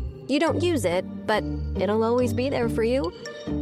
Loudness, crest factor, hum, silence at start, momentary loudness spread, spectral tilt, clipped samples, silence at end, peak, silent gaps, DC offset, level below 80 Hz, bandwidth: -25 LUFS; 12 dB; none; 0 s; 7 LU; -6 dB/octave; under 0.1%; 0 s; -12 dBFS; none; under 0.1%; -38 dBFS; 15 kHz